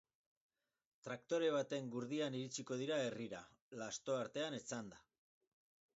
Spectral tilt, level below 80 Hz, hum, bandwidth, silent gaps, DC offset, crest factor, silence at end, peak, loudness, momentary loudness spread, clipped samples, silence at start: -4 dB/octave; -86 dBFS; none; 7.6 kHz; 3.61-3.71 s; under 0.1%; 18 dB; 0.95 s; -28 dBFS; -43 LUFS; 12 LU; under 0.1%; 1.05 s